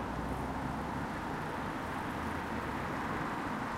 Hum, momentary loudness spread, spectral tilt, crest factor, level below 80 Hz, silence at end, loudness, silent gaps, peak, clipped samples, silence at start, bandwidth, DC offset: none; 2 LU; -6 dB/octave; 12 dB; -50 dBFS; 0 s; -37 LUFS; none; -24 dBFS; under 0.1%; 0 s; 16 kHz; under 0.1%